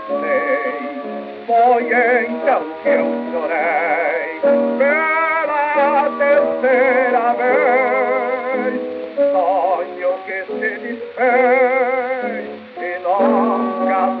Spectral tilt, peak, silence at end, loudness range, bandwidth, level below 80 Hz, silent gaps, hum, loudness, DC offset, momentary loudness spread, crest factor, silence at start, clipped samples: -2.5 dB/octave; -4 dBFS; 0 s; 3 LU; 4.9 kHz; -74 dBFS; none; none; -17 LUFS; under 0.1%; 11 LU; 14 dB; 0 s; under 0.1%